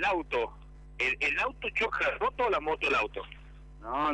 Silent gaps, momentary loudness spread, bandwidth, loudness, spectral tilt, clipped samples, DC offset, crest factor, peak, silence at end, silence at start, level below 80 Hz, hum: none; 13 LU; 11.5 kHz; -30 LUFS; -4 dB/octave; under 0.1%; under 0.1%; 14 dB; -18 dBFS; 0 s; 0 s; -50 dBFS; none